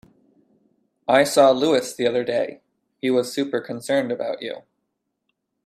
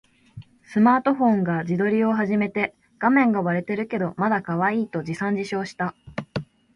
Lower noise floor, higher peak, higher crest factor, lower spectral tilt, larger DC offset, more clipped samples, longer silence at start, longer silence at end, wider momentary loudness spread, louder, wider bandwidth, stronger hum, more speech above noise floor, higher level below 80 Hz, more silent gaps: first, -77 dBFS vs -45 dBFS; about the same, -4 dBFS vs -6 dBFS; about the same, 20 dB vs 18 dB; second, -4 dB/octave vs -8 dB/octave; neither; neither; first, 1.1 s vs 0.35 s; first, 1.05 s vs 0.3 s; first, 15 LU vs 11 LU; about the same, -21 LUFS vs -23 LUFS; first, 15 kHz vs 10.5 kHz; neither; first, 57 dB vs 23 dB; second, -68 dBFS vs -60 dBFS; neither